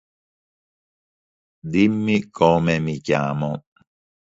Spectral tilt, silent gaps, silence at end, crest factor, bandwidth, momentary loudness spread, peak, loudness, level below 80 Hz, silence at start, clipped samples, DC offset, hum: -7 dB/octave; none; 0.75 s; 22 dB; 7.8 kHz; 10 LU; -2 dBFS; -20 LUFS; -52 dBFS; 1.65 s; under 0.1%; under 0.1%; none